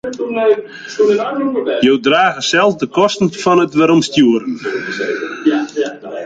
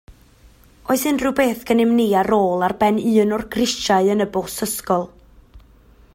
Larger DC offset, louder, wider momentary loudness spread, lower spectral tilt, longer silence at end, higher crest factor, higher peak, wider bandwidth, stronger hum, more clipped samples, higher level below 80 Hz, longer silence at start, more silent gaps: neither; first, -14 LUFS vs -19 LUFS; about the same, 9 LU vs 7 LU; about the same, -4.5 dB/octave vs -4.5 dB/octave; second, 0 s vs 0.55 s; about the same, 14 dB vs 16 dB; about the same, -2 dBFS vs -4 dBFS; second, 9.2 kHz vs 16.5 kHz; neither; neither; second, -56 dBFS vs -48 dBFS; about the same, 0.05 s vs 0.1 s; neither